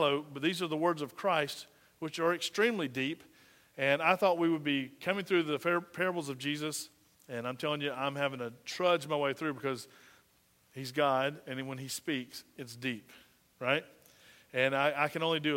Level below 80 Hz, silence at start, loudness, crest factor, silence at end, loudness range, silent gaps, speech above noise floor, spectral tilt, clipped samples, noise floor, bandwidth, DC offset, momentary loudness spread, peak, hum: -80 dBFS; 0 s; -33 LUFS; 22 dB; 0 s; 5 LU; none; 36 dB; -4.5 dB/octave; under 0.1%; -69 dBFS; 16 kHz; under 0.1%; 14 LU; -12 dBFS; none